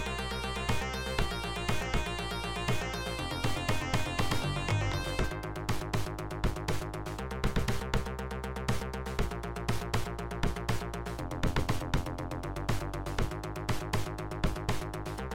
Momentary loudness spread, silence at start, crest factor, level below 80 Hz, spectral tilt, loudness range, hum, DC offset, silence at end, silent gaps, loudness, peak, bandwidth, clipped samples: 6 LU; 0 s; 16 dB; -40 dBFS; -5 dB/octave; 2 LU; none; 0.4%; 0 s; none; -34 LUFS; -16 dBFS; 17 kHz; under 0.1%